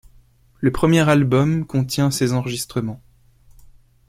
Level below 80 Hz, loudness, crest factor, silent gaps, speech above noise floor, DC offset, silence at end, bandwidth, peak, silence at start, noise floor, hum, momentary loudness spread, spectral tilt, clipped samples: -42 dBFS; -19 LUFS; 18 dB; none; 34 dB; under 0.1%; 1.1 s; 16 kHz; -2 dBFS; 0.6 s; -52 dBFS; none; 11 LU; -6 dB/octave; under 0.1%